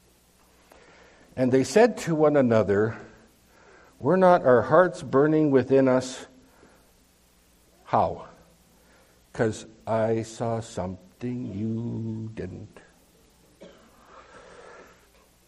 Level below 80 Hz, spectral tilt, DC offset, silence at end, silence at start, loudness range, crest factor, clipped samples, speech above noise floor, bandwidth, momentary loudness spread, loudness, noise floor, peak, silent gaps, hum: -62 dBFS; -6.5 dB/octave; under 0.1%; 1.8 s; 1.35 s; 14 LU; 22 dB; under 0.1%; 38 dB; 13.5 kHz; 18 LU; -23 LUFS; -60 dBFS; -4 dBFS; none; 60 Hz at -55 dBFS